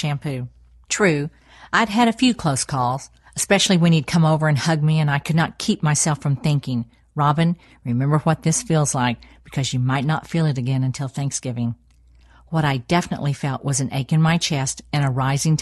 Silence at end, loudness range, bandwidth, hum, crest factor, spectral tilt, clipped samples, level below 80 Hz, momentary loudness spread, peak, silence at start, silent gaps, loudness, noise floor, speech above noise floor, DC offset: 0 s; 5 LU; 12.5 kHz; none; 18 dB; -5 dB/octave; under 0.1%; -50 dBFS; 9 LU; -2 dBFS; 0 s; none; -20 LUFS; -52 dBFS; 32 dB; under 0.1%